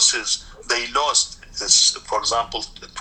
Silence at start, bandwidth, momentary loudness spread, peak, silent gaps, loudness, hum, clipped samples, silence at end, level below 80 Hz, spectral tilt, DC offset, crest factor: 0 s; 15 kHz; 14 LU; -2 dBFS; none; -19 LUFS; none; under 0.1%; 0 s; -46 dBFS; 1.5 dB/octave; under 0.1%; 20 dB